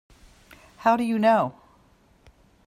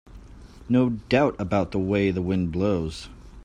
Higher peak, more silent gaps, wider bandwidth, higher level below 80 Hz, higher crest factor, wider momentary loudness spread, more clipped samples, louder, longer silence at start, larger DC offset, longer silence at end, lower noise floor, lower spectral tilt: about the same, -8 dBFS vs -6 dBFS; neither; first, 14 kHz vs 10 kHz; second, -60 dBFS vs -46 dBFS; about the same, 20 dB vs 18 dB; about the same, 6 LU vs 8 LU; neither; about the same, -23 LUFS vs -24 LUFS; first, 0.8 s vs 0.1 s; neither; first, 1.15 s vs 0 s; first, -59 dBFS vs -45 dBFS; about the same, -6.5 dB/octave vs -7.5 dB/octave